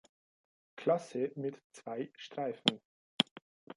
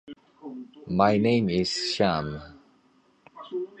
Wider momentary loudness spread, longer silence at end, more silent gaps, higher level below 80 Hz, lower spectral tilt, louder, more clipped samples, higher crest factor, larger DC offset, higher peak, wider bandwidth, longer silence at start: second, 11 LU vs 21 LU; about the same, 0.05 s vs 0.15 s; first, 1.64-1.70 s, 2.85-3.18 s, 3.31-3.36 s, 3.42-3.67 s vs none; second, -80 dBFS vs -54 dBFS; about the same, -4.5 dB/octave vs -5.5 dB/octave; second, -36 LUFS vs -25 LUFS; neither; first, 30 dB vs 22 dB; neither; about the same, -8 dBFS vs -6 dBFS; first, 11.5 kHz vs 9.4 kHz; first, 0.75 s vs 0.05 s